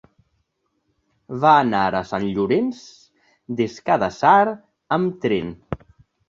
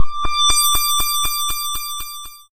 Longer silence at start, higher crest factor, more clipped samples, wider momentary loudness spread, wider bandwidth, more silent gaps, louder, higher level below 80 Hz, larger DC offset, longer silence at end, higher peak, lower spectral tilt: first, 1.3 s vs 0 s; first, 20 dB vs 14 dB; neither; first, 19 LU vs 14 LU; second, 7.6 kHz vs 16 kHz; neither; second, -20 LUFS vs -17 LUFS; second, -54 dBFS vs -32 dBFS; neither; first, 0.55 s vs 0.1 s; about the same, -2 dBFS vs -2 dBFS; first, -6.5 dB/octave vs 1 dB/octave